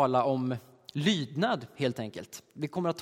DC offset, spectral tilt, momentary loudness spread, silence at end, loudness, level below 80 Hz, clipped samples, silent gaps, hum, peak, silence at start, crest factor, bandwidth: under 0.1%; -5.5 dB/octave; 12 LU; 0 s; -31 LUFS; -72 dBFS; under 0.1%; none; none; -12 dBFS; 0 s; 18 dB; 16.5 kHz